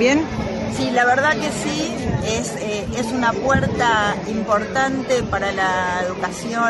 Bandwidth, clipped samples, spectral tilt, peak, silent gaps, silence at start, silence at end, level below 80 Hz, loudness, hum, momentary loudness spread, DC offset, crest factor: 11.5 kHz; under 0.1%; -4.5 dB/octave; -4 dBFS; none; 0 s; 0 s; -40 dBFS; -20 LUFS; none; 7 LU; under 0.1%; 16 dB